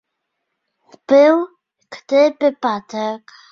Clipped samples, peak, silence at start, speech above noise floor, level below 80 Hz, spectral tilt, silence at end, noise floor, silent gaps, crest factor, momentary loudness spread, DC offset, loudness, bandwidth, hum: under 0.1%; -2 dBFS; 1.1 s; 60 dB; -68 dBFS; -5 dB/octave; 0.35 s; -76 dBFS; none; 16 dB; 14 LU; under 0.1%; -16 LUFS; 7 kHz; none